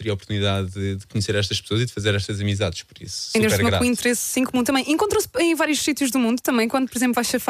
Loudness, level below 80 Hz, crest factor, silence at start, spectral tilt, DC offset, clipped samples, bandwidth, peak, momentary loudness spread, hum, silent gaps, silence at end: -21 LUFS; -50 dBFS; 16 dB; 0 s; -4.5 dB/octave; under 0.1%; under 0.1%; 15.5 kHz; -6 dBFS; 7 LU; none; none; 0 s